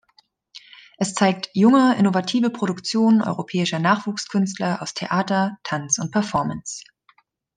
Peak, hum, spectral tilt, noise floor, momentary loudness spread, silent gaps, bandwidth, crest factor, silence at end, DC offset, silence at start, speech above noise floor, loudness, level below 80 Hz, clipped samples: -4 dBFS; none; -4.5 dB/octave; -61 dBFS; 11 LU; none; 10 kHz; 18 dB; 0.75 s; under 0.1%; 0.55 s; 40 dB; -21 LUFS; -62 dBFS; under 0.1%